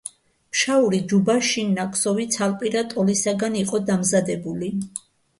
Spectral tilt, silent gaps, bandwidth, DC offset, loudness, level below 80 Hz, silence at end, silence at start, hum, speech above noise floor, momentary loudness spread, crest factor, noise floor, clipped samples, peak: -4 dB/octave; none; 11.5 kHz; under 0.1%; -22 LUFS; -62 dBFS; 0.4 s; 0.05 s; none; 20 dB; 9 LU; 16 dB; -42 dBFS; under 0.1%; -6 dBFS